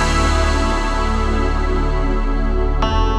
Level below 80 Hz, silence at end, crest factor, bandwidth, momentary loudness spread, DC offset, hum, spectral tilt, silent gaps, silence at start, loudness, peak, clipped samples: -18 dBFS; 0 s; 12 dB; 10 kHz; 4 LU; under 0.1%; none; -5.5 dB/octave; none; 0 s; -19 LUFS; -4 dBFS; under 0.1%